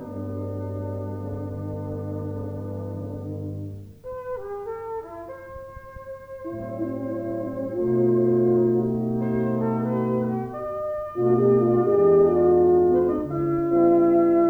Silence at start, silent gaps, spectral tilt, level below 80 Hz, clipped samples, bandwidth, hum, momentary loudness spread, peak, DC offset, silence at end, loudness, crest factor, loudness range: 0 s; none; -11 dB/octave; -52 dBFS; under 0.1%; 2.7 kHz; none; 19 LU; -8 dBFS; under 0.1%; 0 s; -23 LUFS; 14 dB; 14 LU